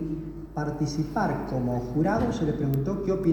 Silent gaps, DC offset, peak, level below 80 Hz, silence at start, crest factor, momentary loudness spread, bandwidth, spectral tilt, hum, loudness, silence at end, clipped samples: none; under 0.1%; -12 dBFS; -44 dBFS; 0 s; 14 dB; 7 LU; over 20 kHz; -7.5 dB/octave; none; -28 LUFS; 0 s; under 0.1%